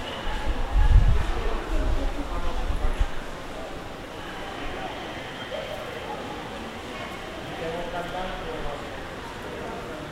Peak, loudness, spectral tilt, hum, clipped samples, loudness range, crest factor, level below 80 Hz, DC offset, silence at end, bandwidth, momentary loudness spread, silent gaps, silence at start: -4 dBFS; -31 LUFS; -5.5 dB/octave; none; under 0.1%; 7 LU; 22 dB; -28 dBFS; under 0.1%; 0 s; 13 kHz; 9 LU; none; 0 s